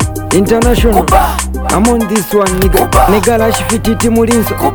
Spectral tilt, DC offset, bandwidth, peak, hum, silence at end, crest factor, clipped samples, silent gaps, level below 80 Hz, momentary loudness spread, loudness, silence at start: -5 dB/octave; under 0.1%; over 20 kHz; 0 dBFS; none; 0 s; 10 dB; 0.4%; none; -18 dBFS; 4 LU; -10 LUFS; 0 s